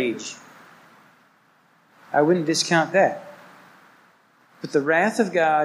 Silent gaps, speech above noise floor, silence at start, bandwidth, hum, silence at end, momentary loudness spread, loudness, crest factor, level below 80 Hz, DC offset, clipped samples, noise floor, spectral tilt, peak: none; 39 dB; 0 s; 15.5 kHz; none; 0 s; 18 LU; -21 LUFS; 18 dB; -78 dBFS; under 0.1%; under 0.1%; -59 dBFS; -4 dB/octave; -4 dBFS